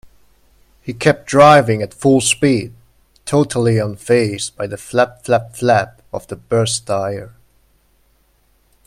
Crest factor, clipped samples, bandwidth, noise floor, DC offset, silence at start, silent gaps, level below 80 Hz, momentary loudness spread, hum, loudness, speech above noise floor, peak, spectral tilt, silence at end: 16 dB; under 0.1%; 15 kHz; -57 dBFS; under 0.1%; 0.85 s; none; -50 dBFS; 18 LU; none; -15 LUFS; 42 dB; 0 dBFS; -5 dB/octave; 1.6 s